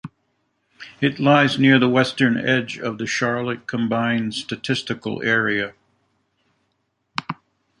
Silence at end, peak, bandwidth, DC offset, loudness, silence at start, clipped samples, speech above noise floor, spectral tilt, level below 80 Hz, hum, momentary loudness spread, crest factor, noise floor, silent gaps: 0.45 s; -2 dBFS; 10.5 kHz; under 0.1%; -20 LUFS; 0.05 s; under 0.1%; 52 dB; -5.5 dB/octave; -62 dBFS; none; 16 LU; 20 dB; -71 dBFS; none